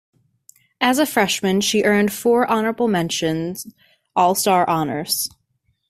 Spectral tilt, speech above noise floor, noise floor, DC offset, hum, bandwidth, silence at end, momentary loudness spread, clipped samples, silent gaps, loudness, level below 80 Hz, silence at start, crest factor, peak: -4 dB/octave; 49 dB; -68 dBFS; under 0.1%; none; 16 kHz; 0.6 s; 9 LU; under 0.1%; none; -19 LUFS; -58 dBFS; 0.8 s; 18 dB; -2 dBFS